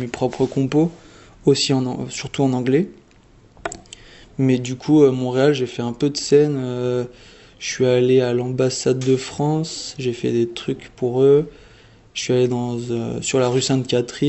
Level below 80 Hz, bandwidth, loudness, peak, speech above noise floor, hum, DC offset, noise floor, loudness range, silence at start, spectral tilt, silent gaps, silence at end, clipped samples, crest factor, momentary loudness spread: -52 dBFS; 8.4 kHz; -20 LUFS; -2 dBFS; 32 dB; none; under 0.1%; -50 dBFS; 3 LU; 0 s; -5.5 dB/octave; none; 0 s; under 0.1%; 18 dB; 12 LU